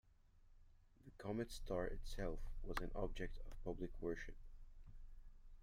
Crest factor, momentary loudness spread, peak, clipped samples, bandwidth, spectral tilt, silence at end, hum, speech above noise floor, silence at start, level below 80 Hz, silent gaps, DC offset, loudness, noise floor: 20 dB; 20 LU; -28 dBFS; under 0.1%; 15.5 kHz; -6 dB/octave; 0 s; none; 23 dB; 0.05 s; -50 dBFS; none; under 0.1%; -49 LUFS; -68 dBFS